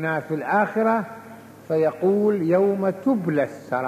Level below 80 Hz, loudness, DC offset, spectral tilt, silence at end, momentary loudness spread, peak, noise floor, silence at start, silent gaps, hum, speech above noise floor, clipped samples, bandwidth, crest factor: -70 dBFS; -22 LUFS; under 0.1%; -8.5 dB/octave; 0 s; 6 LU; -8 dBFS; -43 dBFS; 0 s; none; none; 21 dB; under 0.1%; 15 kHz; 14 dB